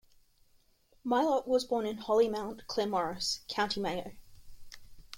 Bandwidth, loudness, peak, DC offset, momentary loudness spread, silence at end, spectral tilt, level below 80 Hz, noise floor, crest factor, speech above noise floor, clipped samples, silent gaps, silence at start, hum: 16.5 kHz; -32 LUFS; -16 dBFS; under 0.1%; 9 LU; 0 s; -3.5 dB/octave; -60 dBFS; -67 dBFS; 18 dB; 35 dB; under 0.1%; none; 1.05 s; none